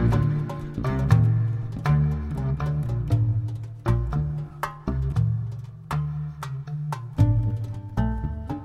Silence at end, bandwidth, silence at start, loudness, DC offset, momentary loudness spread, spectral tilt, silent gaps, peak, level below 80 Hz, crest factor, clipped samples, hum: 0 s; 11.5 kHz; 0 s; -26 LUFS; under 0.1%; 10 LU; -8.5 dB/octave; none; -4 dBFS; -34 dBFS; 20 dB; under 0.1%; none